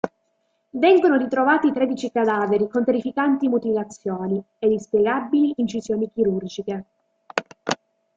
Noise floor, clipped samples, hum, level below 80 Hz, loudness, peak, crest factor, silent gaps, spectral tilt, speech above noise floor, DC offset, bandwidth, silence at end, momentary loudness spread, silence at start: -70 dBFS; under 0.1%; none; -64 dBFS; -22 LUFS; -4 dBFS; 18 dB; none; -6 dB/octave; 50 dB; under 0.1%; 7.8 kHz; 0.4 s; 11 LU; 0.05 s